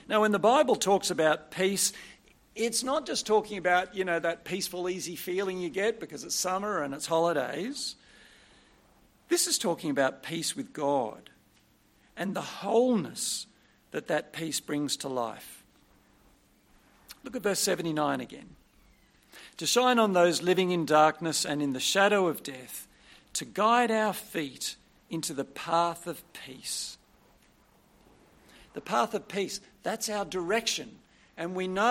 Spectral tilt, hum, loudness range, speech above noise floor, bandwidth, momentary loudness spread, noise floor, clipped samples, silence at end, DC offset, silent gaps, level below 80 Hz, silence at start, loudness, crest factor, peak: -3 dB/octave; none; 9 LU; 35 dB; 16.5 kHz; 16 LU; -64 dBFS; under 0.1%; 0 s; under 0.1%; none; -68 dBFS; 0.1 s; -29 LUFS; 22 dB; -8 dBFS